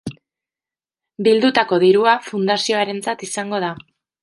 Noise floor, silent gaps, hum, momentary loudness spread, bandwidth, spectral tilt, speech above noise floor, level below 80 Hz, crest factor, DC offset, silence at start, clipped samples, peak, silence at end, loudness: under -90 dBFS; none; none; 11 LU; 11.5 kHz; -4 dB/octave; over 73 dB; -62 dBFS; 16 dB; under 0.1%; 0.05 s; under 0.1%; -2 dBFS; 0.45 s; -17 LUFS